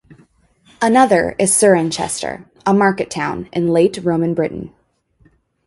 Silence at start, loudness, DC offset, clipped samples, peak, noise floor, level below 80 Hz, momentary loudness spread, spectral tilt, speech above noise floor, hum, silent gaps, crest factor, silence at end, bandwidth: 0.1 s; -16 LUFS; under 0.1%; under 0.1%; 0 dBFS; -56 dBFS; -50 dBFS; 11 LU; -4.5 dB/octave; 41 dB; none; none; 16 dB; 1 s; 12 kHz